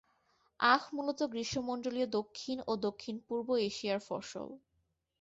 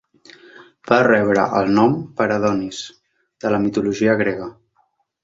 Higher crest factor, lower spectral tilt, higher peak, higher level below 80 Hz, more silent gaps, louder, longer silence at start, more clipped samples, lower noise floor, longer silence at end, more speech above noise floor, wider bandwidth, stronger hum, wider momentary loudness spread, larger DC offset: about the same, 22 dB vs 18 dB; second, -2.5 dB/octave vs -6 dB/octave; second, -14 dBFS vs -2 dBFS; second, -70 dBFS vs -54 dBFS; neither; second, -35 LUFS vs -18 LUFS; about the same, 0.6 s vs 0.6 s; neither; first, -80 dBFS vs -64 dBFS; about the same, 0.65 s vs 0.75 s; about the same, 45 dB vs 47 dB; about the same, 8 kHz vs 7.8 kHz; neither; about the same, 13 LU vs 14 LU; neither